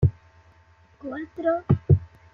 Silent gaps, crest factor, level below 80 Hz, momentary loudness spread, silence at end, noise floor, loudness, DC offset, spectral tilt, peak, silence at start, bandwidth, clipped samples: none; 20 dB; -44 dBFS; 15 LU; 0.3 s; -56 dBFS; -24 LUFS; under 0.1%; -11.5 dB/octave; -6 dBFS; 0 s; 3.7 kHz; under 0.1%